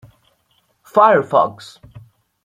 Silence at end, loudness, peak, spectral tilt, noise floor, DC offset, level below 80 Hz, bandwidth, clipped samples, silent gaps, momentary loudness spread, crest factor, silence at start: 0.45 s; -15 LUFS; -2 dBFS; -6 dB/octave; -63 dBFS; under 0.1%; -60 dBFS; 14.5 kHz; under 0.1%; none; 26 LU; 18 dB; 0.95 s